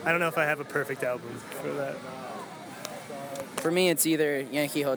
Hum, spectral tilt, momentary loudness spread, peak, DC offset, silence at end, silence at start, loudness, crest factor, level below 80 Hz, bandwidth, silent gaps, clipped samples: none; -3.5 dB/octave; 15 LU; -8 dBFS; under 0.1%; 0 s; 0 s; -29 LUFS; 20 dB; -76 dBFS; over 20 kHz; none; under 0.1%